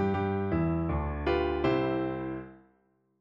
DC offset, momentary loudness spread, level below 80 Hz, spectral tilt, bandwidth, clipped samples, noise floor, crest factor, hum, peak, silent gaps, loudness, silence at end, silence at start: under 0.1%; 10 LU; -42 dBFS; -9.5 dB/octave; 6.6 kHz; under 0.1%; -70 dBFS; 16 dB; none; -16 dBFS; none; -30 LUFS; 0.65 s; 0 s